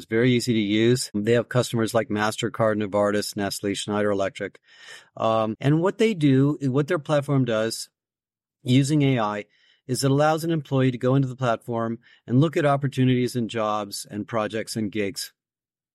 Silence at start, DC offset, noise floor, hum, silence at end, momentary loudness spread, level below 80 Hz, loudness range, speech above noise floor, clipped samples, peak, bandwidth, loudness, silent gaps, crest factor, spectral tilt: 0 s; under 0.1%; under -90 dBFS; none; 0.65 s; 10 LU; -62 dBFS; 2 LU; over 67 dB; under 0.1%; -8 dBFS; 14.5 kHz; -23 LUFS; none; 14 dB; -6 dB/octave